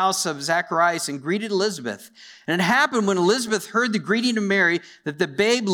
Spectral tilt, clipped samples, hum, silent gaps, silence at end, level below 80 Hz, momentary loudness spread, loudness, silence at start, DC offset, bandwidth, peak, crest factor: -3.5 dB/octave; under 0.1%; none; none; 0 s; -70 dBFS; 8 LU; -21 LUFS; 0 s; under 0.1%; 19.5 kHz; -6 dBFS; 16 dB